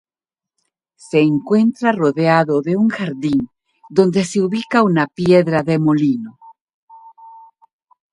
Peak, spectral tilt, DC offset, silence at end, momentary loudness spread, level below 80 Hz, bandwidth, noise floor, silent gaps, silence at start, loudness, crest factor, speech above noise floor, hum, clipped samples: 0 dBFS; -7 dB/octave; under 0.1%; 0.75 s; 6 LU; -58 dBFS; 11.5 kHz; -89 dBFS; 6.61-6.65 s, 6.74-6.87 s; 1.15 s; -16 LUFS; 18 dB; 74 dB; none; under 0.1%